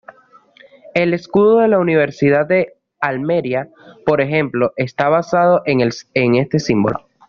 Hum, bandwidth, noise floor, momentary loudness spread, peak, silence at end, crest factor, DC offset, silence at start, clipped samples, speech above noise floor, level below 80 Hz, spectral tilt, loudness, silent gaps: none; 7.2 kHz; -49 dBFS; 9 LU; -2 dBFS; 0.3 s; 14 dB; under 0.1%; 0.95 s; under 0.1%; 34 dB; -54 dBFS; -5.5 dB/octave; -16 LUFS; none